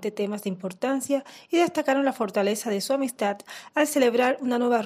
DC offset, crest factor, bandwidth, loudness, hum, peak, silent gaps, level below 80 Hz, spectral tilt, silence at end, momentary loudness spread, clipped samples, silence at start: under 0.1%; 16 dB; 16 kHz; -25 LUFS; none; -10 dBFS; none; -78 dBFS; -4 dB/octave; 0 s; 8 LU; under 0.1%; 0 s